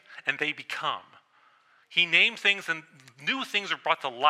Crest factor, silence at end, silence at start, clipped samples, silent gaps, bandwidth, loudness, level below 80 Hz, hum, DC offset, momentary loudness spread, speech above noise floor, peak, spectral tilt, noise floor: 22 dB; 0 s; 0.1 s; under 0.1%; none; 15.5 kHz; -26 LUFS; -86 dBFS; none; under 0.1%; 13 LU; 35 dB; -6 dBFS; -2 dB/octave; -63 dBFS